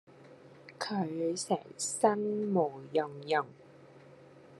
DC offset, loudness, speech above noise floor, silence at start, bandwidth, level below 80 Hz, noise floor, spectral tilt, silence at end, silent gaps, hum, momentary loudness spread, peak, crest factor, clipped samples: under 0.1%; -33 LUFS; 23 dB; 0.1 s; 12.5 kHz; -84 dBFS; -56 dBFS; -4.5 dB/octave; 0 s; none; none; 11 LU; -12 dBFS; 22 dB; under 0.1%